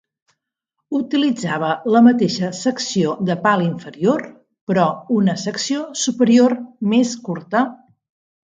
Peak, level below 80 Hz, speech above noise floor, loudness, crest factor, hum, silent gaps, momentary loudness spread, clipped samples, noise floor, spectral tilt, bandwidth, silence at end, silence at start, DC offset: 0 dBFS; -66 dBFS; 61 dB; -18 LUFS; 18 dB; none; 4.61-4.67 s; 10 LU; under 0.1%; -78 dBFS; -5 dB/octave; 9 kHz; 0.8 s; 0.9 s; under 0.1%